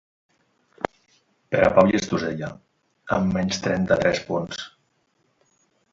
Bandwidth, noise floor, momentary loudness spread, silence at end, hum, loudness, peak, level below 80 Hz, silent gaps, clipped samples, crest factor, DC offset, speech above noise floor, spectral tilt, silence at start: 7.8 kHz; -68 dBFS; 15 LU; 1.25 s; none; -23 LUFS; 0 dBFS; -50 dBFS; none; under 0.1%; 24 dB; under 0.1%; 47 dB; -5.5 dB/octave; 0.8 s